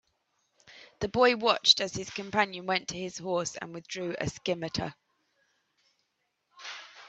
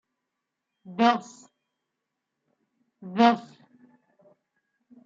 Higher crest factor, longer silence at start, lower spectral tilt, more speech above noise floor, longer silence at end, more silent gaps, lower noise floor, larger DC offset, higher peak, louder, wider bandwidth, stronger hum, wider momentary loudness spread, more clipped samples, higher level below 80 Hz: about the same, 26 dB vs 24 dB; second, 0.7 s vs 0.9 s; second, -3 dB/octave vs -5.5 dB/octave; second, 49 dB vs 60 dB; second, 0 s vs 1.65 s; neither; second, -79 dBFS vs -83 dBFS; neither; about the same, -6 dBFS vs -6 dBFS; second, -28 LUFS vs -24 LUFS; about the same, 8.4 kHz vs 7.8 kHz; neither; about the same, 18 LU vs 18 LU; neither; first, -62 dBFS vs -80 dBFS